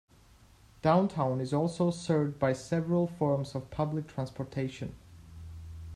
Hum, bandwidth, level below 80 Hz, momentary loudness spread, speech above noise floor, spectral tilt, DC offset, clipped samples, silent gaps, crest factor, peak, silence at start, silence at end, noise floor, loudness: none; 12 kHz; -58 dBFS; 17 LU; 29 dB; -7.5 dB/octave; under 0.1%; under 0.1%; none; 20 dB; -12 dBFS; 0.85 s; 0 s; -59 dBFS; -31 LUFS